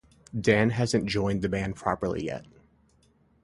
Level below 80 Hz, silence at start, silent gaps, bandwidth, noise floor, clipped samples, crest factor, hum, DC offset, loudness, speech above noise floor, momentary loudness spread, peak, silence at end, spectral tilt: -50 dBFS; 0.35 s; none; 11.5 kHz; -64 dBFS; under 0.1%; 22 dB; none; under 0.1%; -27 LUFS; 37 dB; 12 LU; -6 dBFS; 1 s; -6 dB/octave